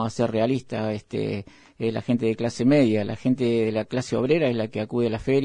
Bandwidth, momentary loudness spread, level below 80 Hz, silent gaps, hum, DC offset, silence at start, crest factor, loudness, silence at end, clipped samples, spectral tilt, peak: 10.5 kHz; 8 LU; -54 dBFS; none; none; under 0.1%; 0 s; 16 dB; -24 LUFS; 0 s; under 0.1%; -7 dB/octave; -8 dBFS